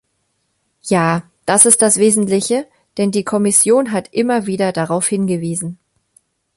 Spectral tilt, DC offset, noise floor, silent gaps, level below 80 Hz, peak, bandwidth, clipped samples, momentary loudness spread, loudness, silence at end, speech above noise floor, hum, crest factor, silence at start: -4 dB/octave; under 0.1%; -67 dBFS; none; -58 dBFS; 0 dBFS; 16 kHz; under 0.1%; 12 LU; -14 LUFS; 0.85 s; 52 dB; none; 16 dB; 0.85 s